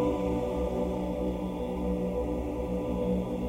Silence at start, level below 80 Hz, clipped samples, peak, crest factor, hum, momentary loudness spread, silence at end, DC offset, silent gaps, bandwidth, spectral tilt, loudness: 0 s; -40 dBFS; under 0.1%; -18 dBFS; 12 dB; none; 3 LU; 0 s; under 0.1%; none; 16 kHz; -8.5 dB/octave; -31 LUFS